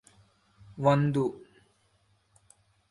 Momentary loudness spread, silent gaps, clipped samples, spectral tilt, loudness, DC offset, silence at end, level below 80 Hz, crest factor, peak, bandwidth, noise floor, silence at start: 26 LU; none; under 0.1%; -8 dB/octave; -27 LUFS; under 0.1%; 1.5 s; -66 dBFS; 22 dB; -10 dBFS; 11.5 kHz; -69 dBFS; 0.75 s